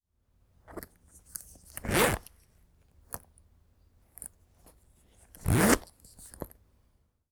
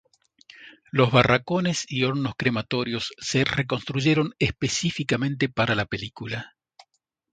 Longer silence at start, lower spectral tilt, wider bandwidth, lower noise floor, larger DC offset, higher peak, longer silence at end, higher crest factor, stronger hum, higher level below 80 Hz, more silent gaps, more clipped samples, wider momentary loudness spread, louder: about the same, 0.7 s vs 0.6 s; about the same, -4.5 dB/octave vs -5 dB/octave; first, over 20 kHz vs 9.4 kHz; about the same, -70 dBFS vs -70 dBFS; neither; second, -6 dBFS vs 0 dBFS; about the same, 0.85 s vs 0.85 s; first, 30 dB vs 24 dB; neither; about the same, -48 dBFS vs -52 dBFS; neither; neither; first, 23 LU vs 11 LU; second, -28 LUFS vs -24 LUFS